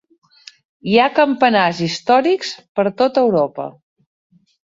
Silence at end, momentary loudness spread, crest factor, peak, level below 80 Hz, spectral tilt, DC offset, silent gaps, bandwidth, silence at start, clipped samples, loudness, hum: 1 s; 10 LU; 16 dB; -2 dBFS; -62 dBFS; -5 dB/octave; under 0.1%; 2.68-2.75 s; 7.8 kHz; 0.85 s; under 0.1%; -16 LUFS; none